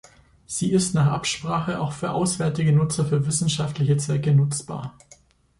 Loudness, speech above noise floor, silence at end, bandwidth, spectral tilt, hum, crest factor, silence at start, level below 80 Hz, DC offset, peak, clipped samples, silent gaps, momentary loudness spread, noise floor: -23 LUFS; 33 dB; 0.7 s; 11.5 kHz; -5.5 dB/octave; none; 14 dB; 0.5 s; -52 dBFS; under 0.1%; -8 dBFS; under 0.1%; none; 8 LU; -55 dBFS